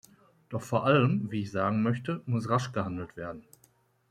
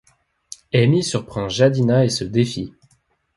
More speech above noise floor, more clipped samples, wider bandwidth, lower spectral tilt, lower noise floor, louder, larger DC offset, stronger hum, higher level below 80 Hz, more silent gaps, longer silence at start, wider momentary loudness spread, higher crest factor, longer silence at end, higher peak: second, 37 dB vs 45 dB; neither; first, 14 kHz vs 11.5 kHz; about the same, -7 dB/octave vs -6 dB/octave; about the same, -66 dBFS vs -63 dBFS; second, -29 LUFS vs -19 LUFS; neither; neither; second, -66 dBFS vs -50 dBFS; neither; second, 0.5 s vs 0.75 s; about the same, 15 LU vs 16 LU; about the same, 20 dB vs 18 dB; about the same, 0.7 s vs 0.65 s; second, -10 dBFS vs -2 dBFS